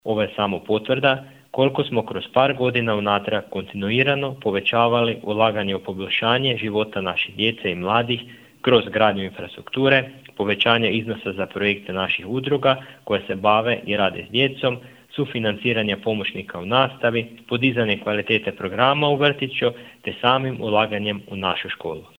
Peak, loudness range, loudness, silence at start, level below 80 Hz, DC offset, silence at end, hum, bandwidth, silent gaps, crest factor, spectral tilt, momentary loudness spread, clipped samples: 0 dBFS; 2 LU; -21 LUFS; 0.05 s; -58 dBFS; under 0.1%; 0.15 s; none; 16 kHz; none; 20 dB; -7 dB/octave; 9 LU; under 0.1%